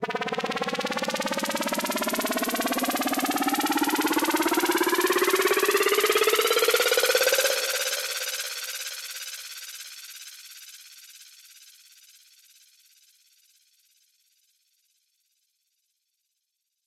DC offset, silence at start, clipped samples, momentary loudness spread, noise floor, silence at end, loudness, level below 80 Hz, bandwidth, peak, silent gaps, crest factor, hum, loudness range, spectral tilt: under 0.1%; 0 s; under 0.1%; 19 LU; -80 dBFS; 5.6 s; -24 LUFS; -70 dBFS; 17 kHz; -10 dBFS; none; 18 dB; none; 18 LU; -1.5 dB/octave